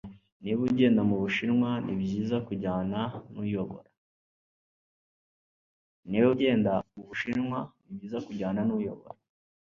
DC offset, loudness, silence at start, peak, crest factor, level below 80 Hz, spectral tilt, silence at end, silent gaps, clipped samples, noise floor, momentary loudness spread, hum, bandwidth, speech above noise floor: under 0.1%; -29 LUFS; 0.05 s; -12 dBFS; 18 dB; -60 dBFS; -8 dB/octave; 0.55 s; 0.32-0.40 s, 3.97-6.03 s; under 0.1%; under -90 dBFS; 15 LU; none; 7.2 kHz; over 62 dB